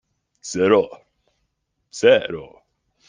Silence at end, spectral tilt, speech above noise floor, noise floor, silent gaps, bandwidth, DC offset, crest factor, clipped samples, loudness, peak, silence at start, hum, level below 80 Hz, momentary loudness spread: 0.65 s; -4 dB/octave; 55 dB; -73 dBFS; none; 9.8 kHz; under 0.1%; 20 dB; under 0.1%; -19 LUFS; -2 dBFS; 0.45 s; none; -62 dBFS; 20 LU